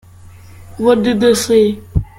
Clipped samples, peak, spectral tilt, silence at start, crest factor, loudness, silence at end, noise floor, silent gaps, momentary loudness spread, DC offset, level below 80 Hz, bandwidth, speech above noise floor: under 0.1%; 0 dBFS; -5 dB/octave; 0.6 s; 14 dB; -13 LUFS; 0.15 s; -38 dBFS; none; 6 LU; under 0.1%; -32 dBFS; 16.5 kHz; 26 dB